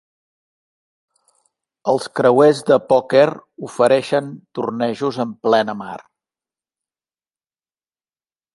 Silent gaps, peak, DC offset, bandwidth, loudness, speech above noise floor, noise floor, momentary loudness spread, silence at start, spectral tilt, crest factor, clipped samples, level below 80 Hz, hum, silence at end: none; -2 dBFS; under 0.1%; 11.5 kHz; -17 LUFS; over 73 dB; under -90 dBFS; 17 LU; 1.85 s; -5.5 dB/octave; 18 dB; under 0.1%; -66 dBFS; none; 2.6 s